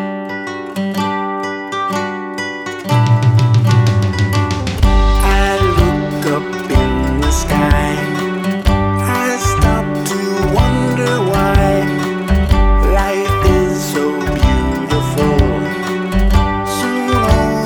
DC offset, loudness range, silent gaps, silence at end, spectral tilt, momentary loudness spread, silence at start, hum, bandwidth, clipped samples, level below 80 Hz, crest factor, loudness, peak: under 0.1%; 2 LU; none; 0 s; -6 dB/octave; 7 LU; 0 s; none; 18.5 kHz; under 0.1%; -18 dBFS; 12 dB; -15 LUFS; 0 dBFS